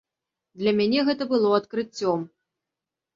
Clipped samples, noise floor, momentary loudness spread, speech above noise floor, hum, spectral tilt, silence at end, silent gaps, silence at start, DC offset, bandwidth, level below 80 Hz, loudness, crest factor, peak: under 0.1%; -87 dBFS; 9 LU; 64 dB; none; -6 dB/octave; 0.9 s; none; 0.55 s; under 0.1%; 7.6 kHz; -68 dBFS; -24 LUFS; 18 dB; -8 dBFS